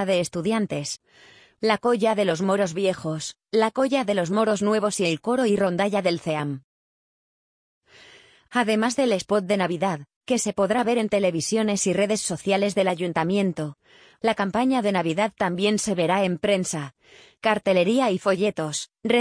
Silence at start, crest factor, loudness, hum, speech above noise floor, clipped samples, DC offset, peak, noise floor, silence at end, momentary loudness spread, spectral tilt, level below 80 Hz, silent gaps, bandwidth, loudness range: 0 s; 16 dB; -23 LUFS; none; 29 dB; under 0.1%; under 0.1%; -6 dBFS; -52 dBFS; 0 s; 7 LU; -4.5 dB/octave; -64 dBFS; 6.64-7.81 s, 10.16-10.21 s; 10.5 kHz; 3 LU